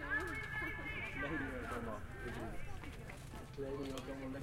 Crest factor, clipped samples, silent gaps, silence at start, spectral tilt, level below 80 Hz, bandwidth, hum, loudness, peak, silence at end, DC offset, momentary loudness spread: 16 dB; under 0.1%; none; 0 s; -5.5 dB/octave; -54 dBFS; 16.5 kHz; none; -44 LUFS; -28 dBFS; 0 s; under 0.1%; 9 LU